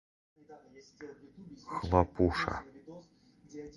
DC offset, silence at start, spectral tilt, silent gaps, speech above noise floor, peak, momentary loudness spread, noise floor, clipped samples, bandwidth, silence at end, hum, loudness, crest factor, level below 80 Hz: under 0.1%; 0.5 s; -7 dB/octave; none; 17 dB; -8 dBFS; 24 LU; -51 dBFS; under 0.1%; 11.5 kHz; 0.05 s; none; -32 LUFS; 28 dB; -48 dBFS